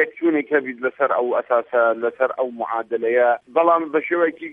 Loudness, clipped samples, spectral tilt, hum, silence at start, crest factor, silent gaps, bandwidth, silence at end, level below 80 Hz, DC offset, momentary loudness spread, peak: -20 LUFS; under 0.1%; -8 dB/octave; none; 0 s; 16 dB; none; 3.8 kHz; 0 s; -76 dBFS; under 0.1%; 6 LU; -4 dBFS